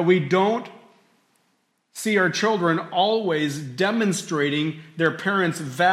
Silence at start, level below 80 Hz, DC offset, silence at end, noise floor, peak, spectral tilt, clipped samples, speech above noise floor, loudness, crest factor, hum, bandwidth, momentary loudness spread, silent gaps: 0 s; -72 dBFS; under 0.1%; 0 s; -69 dBFS; -6 dBFS; -5 dB/octave; under 0.1%; 47 dB; -22 LUFS; 16 dB; none; 15.5 kHz; 8 LU; none